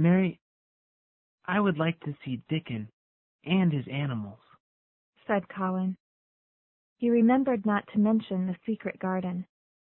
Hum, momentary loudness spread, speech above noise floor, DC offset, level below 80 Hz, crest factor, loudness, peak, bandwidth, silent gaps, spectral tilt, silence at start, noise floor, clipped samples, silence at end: none; 15 LU; over 63 dB; under 0.1%; -68 dBFS; 16 dB; -29 LUFS; -12 dBFS; 4 kHz; 0.41-1.38 s, 2.93-3.39 s, 4.60-5.13 s, 6.00-6.96 s; -11.5 dB/octave; 0 s; under -90 dBFS; under 0.1%; 0.45 s